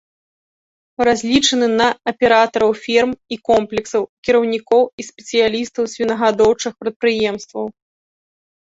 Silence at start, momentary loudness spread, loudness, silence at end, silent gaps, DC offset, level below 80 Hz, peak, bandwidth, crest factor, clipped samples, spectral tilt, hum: 1 s; 10 LU; -17 LUFS; 0.95 s; 4.09-4.23 s, 4.93-4.98 s, 6.96-7.00 s; under 0.1%; -52 dBFS; -2 dBFS; 8 kHz; 16 dB; under 0.1%; -3 dB/octave; none